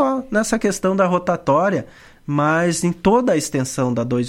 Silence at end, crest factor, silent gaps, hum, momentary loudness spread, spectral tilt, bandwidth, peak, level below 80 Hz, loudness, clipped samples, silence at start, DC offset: 0 s; 16 dB; none; none; 5 LU; -5.5 dB/octave; 16 kHz; -2 dBFS; -46 dBFS; -19 LUFS; under 0.1%; 0 s; under 0.1%